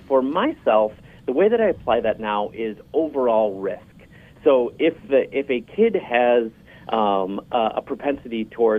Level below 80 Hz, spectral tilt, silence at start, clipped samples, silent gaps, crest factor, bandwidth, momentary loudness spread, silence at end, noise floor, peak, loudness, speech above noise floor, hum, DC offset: -56 dBFS; -7.5 dB/octave; 0.1 s; under 0.1%; none; 16 dB; 4.5 kHz; 9 LU; 0 s; -47 dBFS; -4 dBFS; -21 LUFS; 26 dB; none; under 0.1%